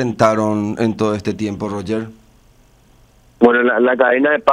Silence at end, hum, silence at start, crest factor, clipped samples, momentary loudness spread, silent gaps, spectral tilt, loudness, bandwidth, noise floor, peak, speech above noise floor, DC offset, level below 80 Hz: 0 s; none; 0 s; 16 dB; under 0.1%; 10 LU; none; -6.5 dB/octave; -16 LUFS; 10.5 kHz; -50 dBFS; 0 dBFS; 35 dB; under 0.1%; -52 dBFS